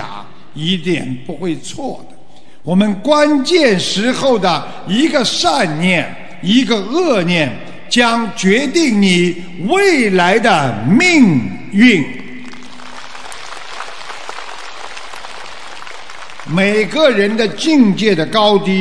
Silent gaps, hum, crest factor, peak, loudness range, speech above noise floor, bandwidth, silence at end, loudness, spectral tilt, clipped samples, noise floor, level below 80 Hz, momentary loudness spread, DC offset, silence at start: none; none; 14 dB; 0 dBFS; 14 LU; 32 dB; 11 kHz; 0 s; -13 LUFS; -5 dB/octave; under 0.1%; -45 dBFS; -52 dBFS; 19 LU; 4%; 0 s